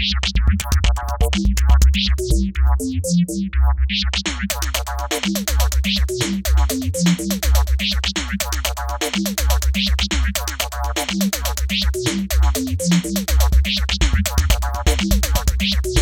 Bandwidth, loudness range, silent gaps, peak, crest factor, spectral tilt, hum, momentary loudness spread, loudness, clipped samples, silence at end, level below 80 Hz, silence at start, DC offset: 18 kHz; 2 LU; none; -2 dBFS; 16 dB; -4 dB/octave; none; 4 LU; -19 LUFS; under 0.1%; 0 s; -20 dBFS; 0 s; under 0.1%